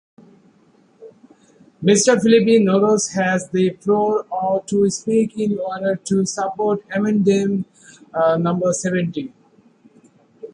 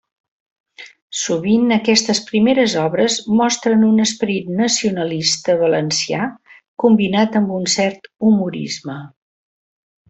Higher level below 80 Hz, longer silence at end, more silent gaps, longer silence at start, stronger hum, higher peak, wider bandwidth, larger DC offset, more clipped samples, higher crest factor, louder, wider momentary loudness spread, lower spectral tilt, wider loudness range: about the same, -62 dBFS vs -58 dBFS; second, 0.05 s vs 1 s; second, none vs 1.02-1.10 s, 6.68-6.77 s; first, 1 s vs 0.8 s; neither; about the same, -2 dBFS vs -2 dBFS; first, 11.5 kHz vs 8.2 kHz; neither; neither; about the same, 18 dB vs 16 dB; about the same, -18 LUFS vs -16 LUFS; about the same, 8 LU vs 9 LU; about the same, -5 dB/octave vs -4 dB/octave; about the same, 4 LU vs 3 LU